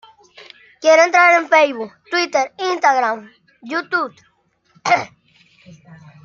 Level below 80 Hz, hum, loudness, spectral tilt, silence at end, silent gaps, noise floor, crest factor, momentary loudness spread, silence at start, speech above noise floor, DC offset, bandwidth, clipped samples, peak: -72 dBFS; none; -16 LUFS; -2.5 dB/octave; 1.2 s; none; -57 dBFS; 18 dB; 16 LU; 0.8 s; 42 dB; under 0.1%; 7.4 kHz; under 0.1%; -2 dBFS